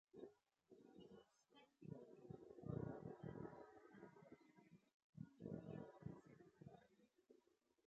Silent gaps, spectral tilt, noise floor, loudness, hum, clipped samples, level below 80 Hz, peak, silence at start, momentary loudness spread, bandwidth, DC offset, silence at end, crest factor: 4.94-5.13 s; -8.5 dB/octave; -81 dBFS; -59 LUFS; none; under 0.1%; -80 dBFS; -36 dBFS; 0.15 s; 14 LU; 7.4 kHz; under 0.1%; 0.5 s; 24 dB